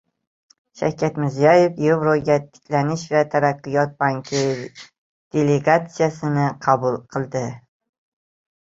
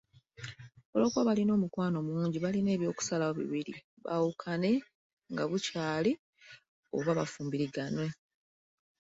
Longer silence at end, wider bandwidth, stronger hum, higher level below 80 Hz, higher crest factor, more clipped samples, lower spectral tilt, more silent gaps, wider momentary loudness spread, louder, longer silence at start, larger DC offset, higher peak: about the same, 1.05 s vs 0.95 s; about the same, 7.8 kHz vs 8 kHz; neither; first, -60 dBFS vs -70 dBFS; about the same, 18 dB vs 18 dB; neither; about the same, -6.5 dB/octave vs -6 dB/octave; second, 4.98-5.31 s vs 0.85-0.93 s, 3.84-3.97 s, 4.95-5.17 s, 6.19-6.33 s, 6.68-6.83 s; about the same, 10 LU vs 12 LU; first, -20 LUFS vs -33 LUFS; first, 0.75 s vs 0.4 s; neither; first, -2 dBFS vs -16 dBFS